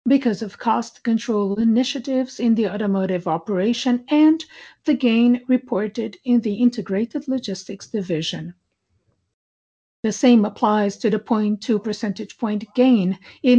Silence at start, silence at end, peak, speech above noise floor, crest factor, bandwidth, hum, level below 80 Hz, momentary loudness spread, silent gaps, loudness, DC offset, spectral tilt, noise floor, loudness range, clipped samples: 0.05 s; 0 s; -6 dBFS; 50 dB; 14 dB; 8 kHz; none; -64 dBFS; 11 LU; 9.34-10.03 s; -21 LUFS; under 0.1%; -6 dB/octave; -69 dBFS; 4 LU; under 0.1%